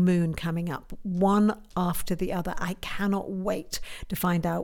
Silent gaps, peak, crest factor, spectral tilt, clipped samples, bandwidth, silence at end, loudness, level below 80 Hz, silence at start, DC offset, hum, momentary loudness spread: none; -12 dBFS; 14 dB; -6.5 dB/octave; under 0.1%; 18.5 kHz; 0 s; -28 LUFS; -44 dBFS; 0 s; under 0.1%; none; 10 LU